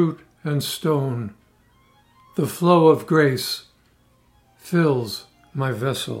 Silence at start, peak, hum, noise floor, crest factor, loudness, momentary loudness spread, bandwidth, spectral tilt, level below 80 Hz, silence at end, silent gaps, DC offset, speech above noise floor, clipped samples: 0 s; -2 dBFS; none; -59 dBFS; 20 dB; -21 LUFS; 16 LU; 16 kHz; -6 dB/octave; -64 dBFS; 0 s; none; under 0.1%; 39 dB; under 0.1%